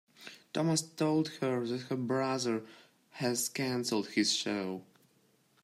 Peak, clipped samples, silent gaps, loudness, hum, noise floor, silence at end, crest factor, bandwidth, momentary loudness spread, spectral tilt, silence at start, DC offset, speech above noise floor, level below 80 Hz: -18 dBFS; under 0.1%; none; -33 LUFS; none; -70 dBFS; 0.8 s; 18 dB; 15.5 kHz; 10 LU; -4 dB/octave; 0.2 s; under 0.1%; 37 dB; -80 dBFS